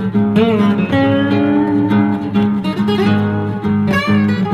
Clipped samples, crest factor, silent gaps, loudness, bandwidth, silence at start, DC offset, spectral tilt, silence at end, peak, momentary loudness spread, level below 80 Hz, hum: under 0.1%; 12 dB; none; -14 LUFS; 6.8 kHz; 0 s; under 0.1%; -8 dB/octave; 0 s; -2 dBFS; 3 LU; -48 dBFS; none